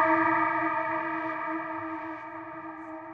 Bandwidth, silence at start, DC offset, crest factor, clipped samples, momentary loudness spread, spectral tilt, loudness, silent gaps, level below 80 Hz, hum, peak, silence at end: 6 kHz; 0 s; under 0.1%; 18 dB; under 0.1%; 16 LU; -7.5 dB/octave; -29 LUFS; none; -70 dBFS; none; -12 dBFS; 0 s